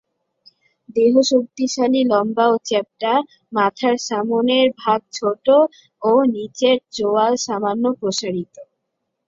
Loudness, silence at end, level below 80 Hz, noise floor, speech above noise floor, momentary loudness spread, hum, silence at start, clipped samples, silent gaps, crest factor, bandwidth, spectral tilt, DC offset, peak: -18 LUFS; 0.65 s; -66 dBFS; -76 dBFS; 58 dB; 8 LU; none; 0.95 s; under 0.1%; none; 16 dB; 7.8 kHz; -4 dB/octave; under 0.1%; -2 dBFS